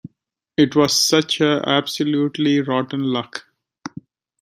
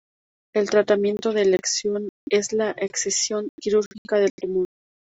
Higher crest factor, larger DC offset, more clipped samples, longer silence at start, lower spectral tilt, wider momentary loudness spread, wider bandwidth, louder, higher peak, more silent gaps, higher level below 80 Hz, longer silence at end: about the same, 18 dB vs 18 dB; neither; neither; second, 0.05 s vs 0.55 s; about the same, -4 dB/octave vs -3 dB/octave; first, 20 LU vs 7 LU; first, 16 kHz vs 8.2 kHz; first, -18 LUFS vs -23 LUFS; first, -2 dBFS vs -6 dBFS; second, none vs 2.09-2.27 s, 3.49-3.58 s, 3.86-3.91 s, 3.98-4.05 s, 4.30-4.38 s; about the same, -62 dBFS vs -64 dBFS; about the same, 0.55 s vs 0.5 s